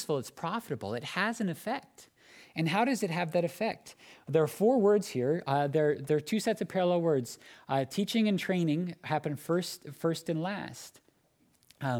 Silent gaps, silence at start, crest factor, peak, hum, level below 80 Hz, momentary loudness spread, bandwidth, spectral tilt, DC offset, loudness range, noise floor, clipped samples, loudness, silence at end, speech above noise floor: none; 0 s; 18 dB; -14 dBFS; none; -76 dBFS; 12 LU; 18.5 kHz; -6 dB/octave; under 0.1%; 5 LU; -69 dBFS; under 0.1%; -31 LUFS; 0 s; 39 dB